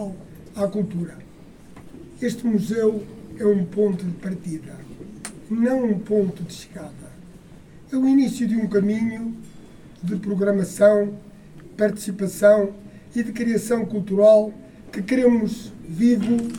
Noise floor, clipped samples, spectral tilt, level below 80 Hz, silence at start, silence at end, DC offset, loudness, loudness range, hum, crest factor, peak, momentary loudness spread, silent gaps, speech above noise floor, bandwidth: -45 dBFS; under 0.1%; -7 dB/octave; -54 dBFS; 0 s; 0 s; under 0.1%; -21 LUFS; 6 LU; none; 18 dB; -4 dBFS; 21 LU; none; 24 dB; 16.5 kHz